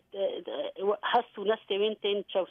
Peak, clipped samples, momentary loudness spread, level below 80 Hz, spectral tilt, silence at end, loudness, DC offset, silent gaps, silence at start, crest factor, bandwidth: -14 dBFS; under 0.1%; 6 LU; -80 dBFS; -6.5 dB/octave; 0.05 s; -31 LUFS; under 0.1%; none; 0.15 s; 18 dB; 5 kHz